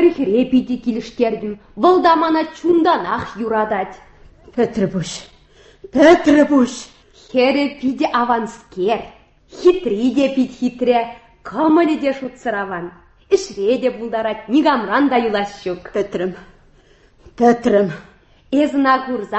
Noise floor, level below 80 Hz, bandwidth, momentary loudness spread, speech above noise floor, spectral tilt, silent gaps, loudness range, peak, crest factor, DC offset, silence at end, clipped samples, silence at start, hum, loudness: -50 dBFS; -50 dBFS; 8.4 kHz; 12 LU; 34 dB; -5.5 dB/octave; none; 4 LU; 0 dBFS; 16 dB; under 0.1%; 0 s; under 0.1%; 0 s; none; -17 LUFS